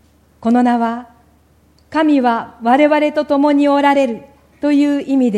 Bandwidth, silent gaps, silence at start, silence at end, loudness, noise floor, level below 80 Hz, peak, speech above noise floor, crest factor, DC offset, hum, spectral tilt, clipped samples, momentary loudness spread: 9.6 kHz; none; 0.4 s; 0 s; -14 LUFS; -52 dBFS; -56 dBFS; 0 dBFS; 38 dB; 14 dB; under 0.1%; none; -6 dB/octave; under 0.1%; 10 LU